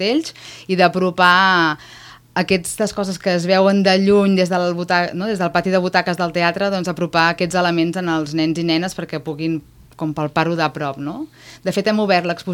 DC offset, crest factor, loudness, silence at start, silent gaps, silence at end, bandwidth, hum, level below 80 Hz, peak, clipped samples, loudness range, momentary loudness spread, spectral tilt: under 0.1%; 18 dB; -18 LUFS; 0 s; none; 0 s; 16.5 kHz; none; -54 dBFS; 0 dBFS; under 0.1%; 5 LU; 12 LU; -5 dB/octave